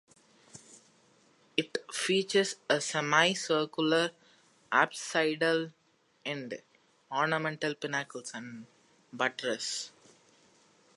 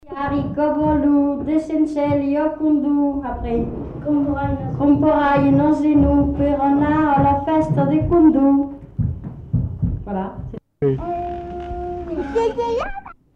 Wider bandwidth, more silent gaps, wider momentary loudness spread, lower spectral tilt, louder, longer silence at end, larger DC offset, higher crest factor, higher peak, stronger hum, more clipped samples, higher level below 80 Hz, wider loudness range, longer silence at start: first, 11.5 kHz vs 6.4 kHz; neither; first, 16 LU vs 12 LU; second, -3 dB/octave vs -9.5 dB/octave; second, -31 LUFS vs -19 LUFS; first, 1.05 s vs 0.25 s; neither; first, 24 dB vs 14 dB; second, -10 dBFS vs -4 dBFS; neither; neither; second, -84 dBFS vs -34 dBFS; about the same, 7 LU vs 8 LU; first, 0.55 s vs 0.05 s